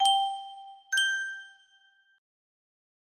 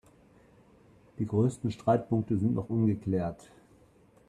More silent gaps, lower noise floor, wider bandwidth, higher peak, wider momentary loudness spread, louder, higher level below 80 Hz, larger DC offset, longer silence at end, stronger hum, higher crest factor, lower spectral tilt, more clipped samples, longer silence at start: neither; about the same, -64 dBFS vs -61 dBFS; first, 15.5 kHz vs 11 kHz; about the same, -12 dBFS vs -14 dBFS; first, 21 LU vs 8 LU; about the same, -28 LUFS vs -30 LUFS; second, -86 dBFS vs -60 dBFS; neither; first, 1.65 s vs 0.95 s; neither; about the same, 20 dB vs 18 dB; second, 5 dB/octave vs -9 dB/octave; neither; second, 0 s vs 1.2 s